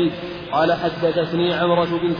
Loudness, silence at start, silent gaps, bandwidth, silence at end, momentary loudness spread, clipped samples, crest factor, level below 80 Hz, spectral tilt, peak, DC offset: -20 LUFS; 0 s; none; 5.2 kHz; 0 s; 5 LU; under 0.1%; 14 dB; -50 dBFS; -8 dB/octave; -6 dBFS; under 0.1%